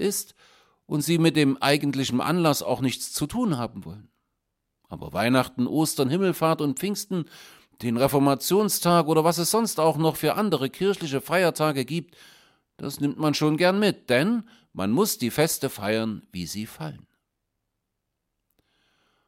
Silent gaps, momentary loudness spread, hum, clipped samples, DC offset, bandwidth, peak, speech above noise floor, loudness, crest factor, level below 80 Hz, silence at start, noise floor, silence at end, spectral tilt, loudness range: none; 12 LU; none; under 0.1%; under 0.1%; 16.5 kHz; -4 dBFS; 56 dB; -24 LUFS; 22 dB; -60 dBFS; 0 s; -80 dBFS; 2.3 s; -5 dB/octave; 5 LU